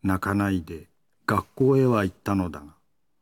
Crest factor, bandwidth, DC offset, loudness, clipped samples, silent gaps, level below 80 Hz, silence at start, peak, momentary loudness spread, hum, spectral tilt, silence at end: 18 dB; 18 kHz; under 0.1%; -25 LUFS; under 0.1%; none; -54 dBFS; 0.05 s; -6 dBFS; 17 LU; none; -7.5 dB/octave; 0.5 s